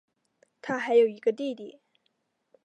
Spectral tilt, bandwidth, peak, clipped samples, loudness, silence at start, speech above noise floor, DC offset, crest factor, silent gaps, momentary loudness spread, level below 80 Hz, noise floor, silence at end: -5.5 dB/octave; 8 kHz; -10 dBFS; under 0.1%; -26 LUFS; 0.65 s; 50 dB; under 0.1%; 18 dB; none; 19 LU; -82 dBFS; -76 dBFS; 0.95 s